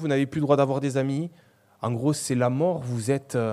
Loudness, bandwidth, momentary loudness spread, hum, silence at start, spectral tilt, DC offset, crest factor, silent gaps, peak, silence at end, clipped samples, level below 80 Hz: -25 LUFS; 14.5 kHz; 9 LU; none; 0 s; -6.5 dB/octave; under 0.1%; 20 dB; none; -6 dBFS; 0 s; under 0.1%; -66 dBFS